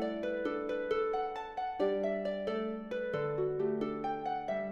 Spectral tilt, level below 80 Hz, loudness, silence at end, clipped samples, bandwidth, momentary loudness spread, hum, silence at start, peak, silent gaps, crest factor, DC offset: -7.5 dB/octave; -64 dBFS; -35 LUFS; 0 s; under 0.1%; 7.4 kHz; 5 LU; none; 0 s; -20 dBFS; none; 16 dB; under 0.1%